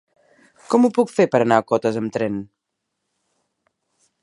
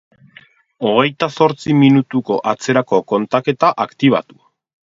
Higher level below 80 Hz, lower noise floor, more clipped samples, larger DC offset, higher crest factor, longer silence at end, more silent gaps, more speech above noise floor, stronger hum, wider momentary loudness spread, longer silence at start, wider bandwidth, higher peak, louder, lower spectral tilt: about the same, -64 dBFS vs -60 dBFS; first, -78 dBFS vs -47 dBFS; neither; neither; first, 22 dB vs 16 dB; first, 1.75 s vs 0.65 s; neither; first, 60 dB vs 32 dB; neither; about the same, 8 LU vs 6 LU; about the same, 0.7 s vs 0.8 s; first, 11.5 kHz vs 7.8 kHz; about the same, 0 dBFS vs 0 dBFS; second, -19 LUFS vs -15 LUFS; about the same, -6.5 dB/octave vs -6.5 dB/octave